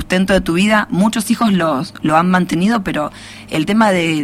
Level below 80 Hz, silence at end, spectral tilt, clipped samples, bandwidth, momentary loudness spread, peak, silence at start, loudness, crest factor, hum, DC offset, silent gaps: -40 dBFS; 0 s; -5.5 dB/octave; under 0.1%; 15.5 kHz; 8 LU; 0 dBFS; 0 s; -15 LUFS; 14 dB; none; under 0.1%; none